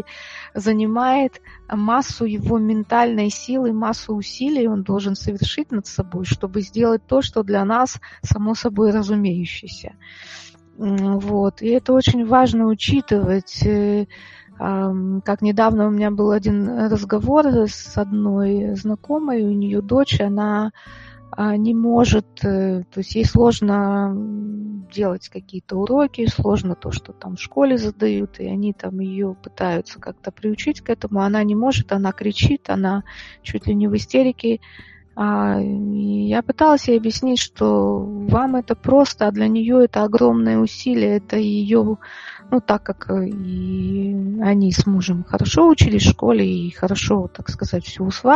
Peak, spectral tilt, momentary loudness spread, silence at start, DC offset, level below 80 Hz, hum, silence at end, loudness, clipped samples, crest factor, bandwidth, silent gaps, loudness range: 0 dBFS; -6.5 dB/octave; 11 LU; 0.1 s; under 0.1%; -38 dBFS; none; 0 s; -19 LUFS; under 0.1%; 18 dB; 7.6 kHz; none; 5 LU